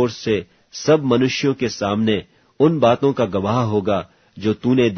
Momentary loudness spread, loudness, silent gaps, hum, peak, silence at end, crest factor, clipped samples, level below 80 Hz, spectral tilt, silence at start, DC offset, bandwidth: 9 LU; -19 LUFS; none; none; -2 dBFS; 0 s; 16 dB; under 0.1%; -54 dBFS; -6 dB/octave; 0 s; under 0.1%; 6.6 kHz